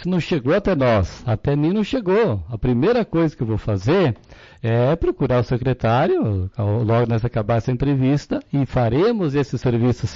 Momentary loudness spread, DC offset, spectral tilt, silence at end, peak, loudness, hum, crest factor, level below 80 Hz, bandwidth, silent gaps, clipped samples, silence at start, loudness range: 5 LU; under 0.1%; -8 dB/octave; 0 s; -10 dBFS; -20 LUFS; none; 10 dB; -38 dBFS; 7.6 kHz; none; under 0.1%; 0 s; 1 LU